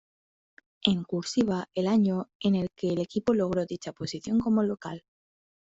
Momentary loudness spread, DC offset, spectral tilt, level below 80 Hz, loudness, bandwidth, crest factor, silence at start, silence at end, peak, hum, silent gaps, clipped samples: 11 LU; under 0.1%; -6 dB/octave; -62 dBFS; -28 LUFS; 8 kHz; 22 dB; 0.85 s; 0.8 s; -6 dBFS; none; 2.35-2.40 s; under 0.1%